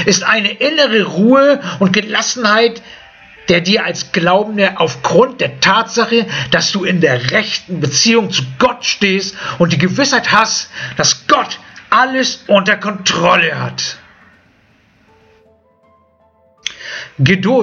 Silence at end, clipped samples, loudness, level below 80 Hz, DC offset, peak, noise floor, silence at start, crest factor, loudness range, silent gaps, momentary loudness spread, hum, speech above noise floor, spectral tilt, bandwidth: 0 s; under 0.1%; -13 LUFS; -50 dBFS; under 0.1%; 0 dBFS; -53 dBFS; 0 s; 14 dB; 6 LU; none; 9 LU; none; 40 dB; -3.5 dB/octave; 7.6 kHz